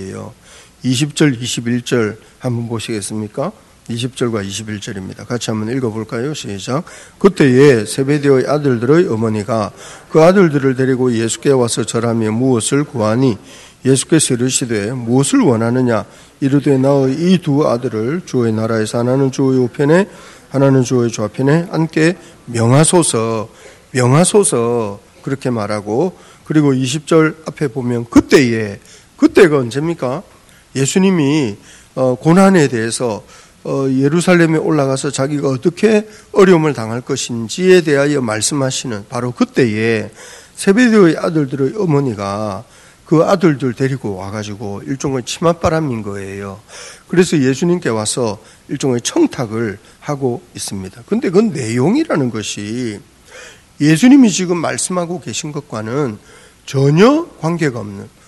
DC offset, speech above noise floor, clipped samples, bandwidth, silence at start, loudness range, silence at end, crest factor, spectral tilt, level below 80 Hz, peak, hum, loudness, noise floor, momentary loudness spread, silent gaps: under 0.1%; 24 dB; 0.3%; 12.5 kHz; 0 s; 5 LU; 0.2 s; 14 dB; -5.5 dB/octave; -50 dBFS; 0 dBFS; none; -15 LUFS; -38 dBFS; 14 LU; none